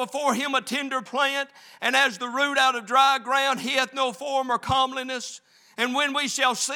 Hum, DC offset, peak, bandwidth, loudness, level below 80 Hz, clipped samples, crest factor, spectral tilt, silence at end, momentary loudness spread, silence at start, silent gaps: none; under 0.1%; -6 dBFS; over 20 kHz; -23 LUFS; -64 dBFS; under 0.1%; 18 dB; -1.5 dB/octave; 0 s; 10 LU; 0 s; none